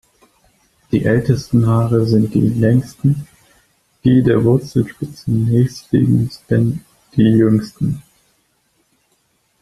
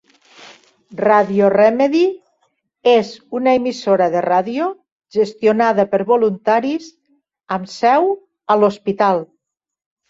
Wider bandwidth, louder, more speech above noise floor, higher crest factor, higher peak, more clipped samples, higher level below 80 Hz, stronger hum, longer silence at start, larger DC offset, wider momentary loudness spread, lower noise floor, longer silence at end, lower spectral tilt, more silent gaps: first, 13 kHz vs 7.8 kHz; about the same, -16 LUFS vs -16 LUFS; second, 48 dB vs 65 dB; about the same, 14 dB vs 16 dB; about the same, -2 dBFS vs -2 dBFS; neither; first, -44 dBFS vs -64 dBFS; neither; first, 0.9 s vs 0.4 s; neither; about the same, 9 LU vs 11 LU; second, -62 dBFS vs -81 dBFS; first, 1.6 s vs 0.85 s; first, -8.5 dB/octave vs -6 dB/octave; second, none vs 4.92-4.97 s